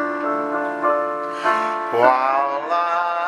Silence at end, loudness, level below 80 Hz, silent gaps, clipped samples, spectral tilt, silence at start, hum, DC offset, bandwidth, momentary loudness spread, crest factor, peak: 0 s; -20 LUFS; -74 dBFS; none; under 0.1%; -4.5 dB/octave; 0 s; none; under 0.1%; 14 kHz; 6 LU; 20 dB; 0 dBFS